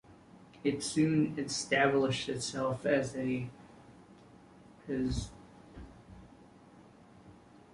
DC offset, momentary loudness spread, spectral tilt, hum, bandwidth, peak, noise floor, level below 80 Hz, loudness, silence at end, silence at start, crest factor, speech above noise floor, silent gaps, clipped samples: under 0.1%; 24 LU; -5 dB/octave; none; 11.5 kHz; -16 dBFS; -57 dBFS; -54 dBFS; -32 LUFS; 0.4 s; 0.1 s; 20 dB; 26 dB; none; under 0.1%